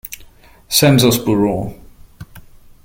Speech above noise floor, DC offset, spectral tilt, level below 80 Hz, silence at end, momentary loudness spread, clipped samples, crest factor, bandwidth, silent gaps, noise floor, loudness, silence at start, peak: 30 dB; under 0.1%; -4.5 dB/octave; -42 dBFS; 0.45 s; 20 LU; under 0.1%; 18 dB; 17 kHz; none; -43 dBFS; -14 LUFS; 0.05 s; 0 dBFS